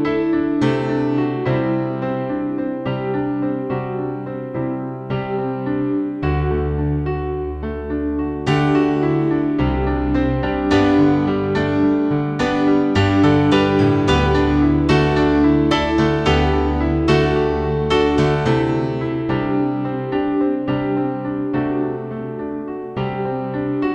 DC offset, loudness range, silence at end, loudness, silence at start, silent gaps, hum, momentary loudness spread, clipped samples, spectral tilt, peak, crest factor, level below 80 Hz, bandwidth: under 0.1%; 7 LU; 0 s; -19 LUFS; 0 s; none; none; 9 LU; under 0.1%; -7.5 dB/octave; -4 dBFS; 14 dB; -32 dBFS; 8.4 kHz